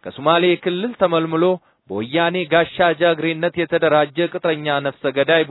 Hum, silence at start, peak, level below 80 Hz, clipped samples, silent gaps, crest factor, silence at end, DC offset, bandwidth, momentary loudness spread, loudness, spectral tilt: none; 0.05 s; 0 dBFS; -60 dBFS; under 0.1%; none; 18 dB; 0 s; under 0.1%; 4.1 kHz; 6 LU; -18 LUFS; -8.5 dB/octave